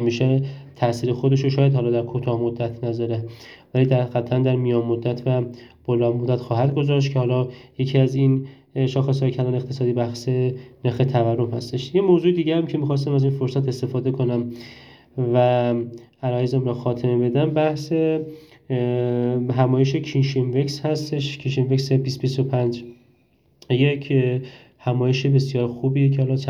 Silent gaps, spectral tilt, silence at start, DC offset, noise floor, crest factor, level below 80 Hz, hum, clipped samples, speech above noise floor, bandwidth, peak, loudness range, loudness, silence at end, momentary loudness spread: none; -8 dB/octave; 0 s; under 0.1%; -60 dBFS; 18 dB; -58 dBFS; none; under 0.1%; 40 dB; 7.2 kHz; -4 dBFS; 2 LU; -21 LUFS; 0 s; 8 LU